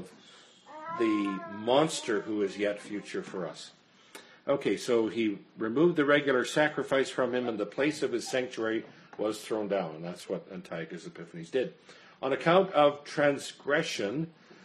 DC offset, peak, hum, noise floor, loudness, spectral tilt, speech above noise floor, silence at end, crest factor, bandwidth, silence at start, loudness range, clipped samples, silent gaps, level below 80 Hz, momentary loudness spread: under 0.1%; -10 dBFS; none; -56 dBFS; -30 LUFS; -5 dB/octave; 26 dB; 0.1 s; 20 dB; 13 kHz; 0 s; 7 LU; under 0.1%; none; -76 dBFS; 15 LU